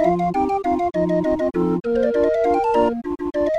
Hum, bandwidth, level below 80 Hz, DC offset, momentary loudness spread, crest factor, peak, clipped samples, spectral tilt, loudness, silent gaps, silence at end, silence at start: none; 9.8 kHz; -44 dBFS; under 0.1%; 4 LU; 14 dB; -6 dBFS; under 0.1%; -8 dB/octave; -20 LUFS; none; 0 s; 0 s